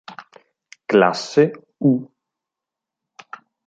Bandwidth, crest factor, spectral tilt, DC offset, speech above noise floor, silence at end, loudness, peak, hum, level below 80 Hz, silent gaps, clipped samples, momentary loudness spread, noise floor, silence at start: 8.6 kHz; 20 dB; -6 dB/octave; under 0.1%; 69 dB; 1.6 s; -18 LUFS; -2 dBFS; none; -70 dBFS; none; under 0.1%; 24 LU; -86 dBFS; 0.1 s